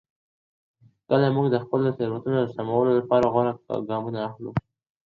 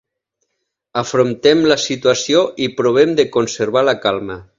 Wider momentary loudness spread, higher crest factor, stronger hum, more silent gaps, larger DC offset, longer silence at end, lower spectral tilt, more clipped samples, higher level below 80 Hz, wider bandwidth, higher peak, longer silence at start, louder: first, 10 LU vs 6 LU; about the same, 18 dB vs 16 dB; neither; neither; neither; first, 0.45 s vs 0.15 s; first, -9.5 dB/octave vs -4 dB/octave; neither; about the same, -58 dBFS vs -54 dBFS; about the same, 7.2 kHz vs 7.8 kHz; second, -6 dBFS vs 0 dBFS; first, 1.1 s vs 0.95 s; second, -24 LUFS vs -15 LUFS